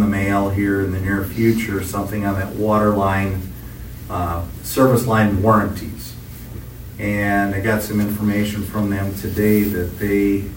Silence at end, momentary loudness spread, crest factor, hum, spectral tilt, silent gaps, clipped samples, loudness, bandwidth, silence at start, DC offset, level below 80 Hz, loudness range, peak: 0 s; 17 LU; 18 dB; none; -6.5 dB/octave; none; under 0.1%; -19 LUFS; 16.5 kHz; 0 s; under 0.1%; -36 dBFS; 3 LU; -2 dBFS